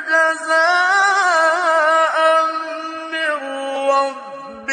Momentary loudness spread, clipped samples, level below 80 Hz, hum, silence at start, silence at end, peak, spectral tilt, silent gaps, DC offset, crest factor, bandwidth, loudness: 12 LU; under 0.1%; -72 dBFS; none; 0 s; 0 s; -4 dBFS; 0 dB/octave; none; under 0.1%; 14 dB; 10 kHz; -16 LUFS